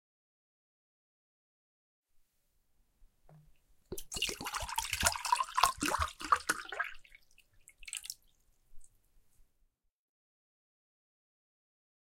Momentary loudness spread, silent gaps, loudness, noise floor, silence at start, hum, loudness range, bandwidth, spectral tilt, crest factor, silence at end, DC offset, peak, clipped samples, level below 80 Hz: 16 LU; none; -34 LUFS; -75 dBFS; 3 s; none; 17 LU; 17 kHz; -1 dB/octave; 32 dB; 3.35 s; under 0.1%; -8 dBFS; under 0.1%; -58 dBFS